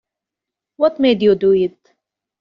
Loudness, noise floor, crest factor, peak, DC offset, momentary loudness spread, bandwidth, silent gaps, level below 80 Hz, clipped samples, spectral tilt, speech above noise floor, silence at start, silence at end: -16 LUFS; -85 dBFS; 16 dB; -2 dBFS; under 0.1%; 5 LU; 5.6 kHz; none; -56 dBFS; under 0.1%; -5 dB/octave; 70 dB; 0.8 s; 0.7 s